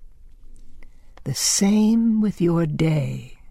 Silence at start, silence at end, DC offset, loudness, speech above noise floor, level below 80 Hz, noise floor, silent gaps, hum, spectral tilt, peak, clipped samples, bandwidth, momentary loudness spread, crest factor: 0 s; 0 s; under 0.1%; -20 LUFS; 21 dB; -44 dBFS; -41 dBFS; none; none; -5 dB/octave; -8 dBFS; under 0.1%; 15.5 kHz; 13 LU; 14 dB